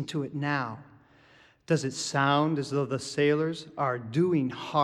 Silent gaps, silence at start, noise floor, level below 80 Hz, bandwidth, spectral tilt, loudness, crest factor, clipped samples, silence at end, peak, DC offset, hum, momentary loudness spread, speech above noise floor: none; 0 s; -59 dBFS; -68 dBFS; 12 kHz; -5.5 dB/octave; -28 LUFS; 18 dB; under 0.1%; 0 s; -10 dBFS; under 0.1%; none; 7 LU; 31 dB